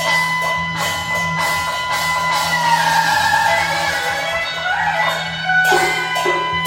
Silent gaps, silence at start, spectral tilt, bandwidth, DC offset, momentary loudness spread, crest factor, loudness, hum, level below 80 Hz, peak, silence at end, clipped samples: none; 0 s; -2 dB/octave; 17 kHz; under 0.1%; 5 LU; 16 dB; -16 LUFS; none; -46 dBFS; -2 dBFS; 0 s; under 0.1%